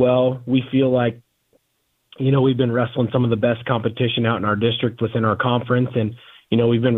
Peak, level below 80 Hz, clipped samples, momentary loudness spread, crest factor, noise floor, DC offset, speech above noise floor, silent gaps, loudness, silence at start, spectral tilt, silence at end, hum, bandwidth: -2 dBFS; -56 dBFS; under 0.1%; 5 LU; 18 dB; -69 dBFS; under 0.1%; 51 dB; none; -20 LUFS; 0 s; -10 dB/octave; 0 s; none; 4 kHz